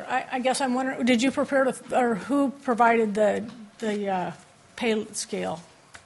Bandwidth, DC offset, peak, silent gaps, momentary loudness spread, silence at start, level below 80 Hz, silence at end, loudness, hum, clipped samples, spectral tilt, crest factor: 11.5 kHz; under 0.1%; -8 dBFS; none; 11 LU; 0 s; -68 dBFS; 0.1 s; -25 LUFS; none; under 0.1%; -4.5 dB/octave; 18 dB